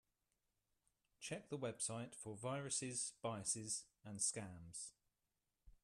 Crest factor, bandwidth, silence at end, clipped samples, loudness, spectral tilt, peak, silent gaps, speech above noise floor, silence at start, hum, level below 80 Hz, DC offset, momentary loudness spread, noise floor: 22 dB; 13.5 kHz; 0.15 s; under 0.1%; -45 LUFS; -3 dB/octave; -28 dBFS; none; 43 dB; 1.2 s; none; -78 dBFS; under 0.1%; 10 LU; -90 dBFS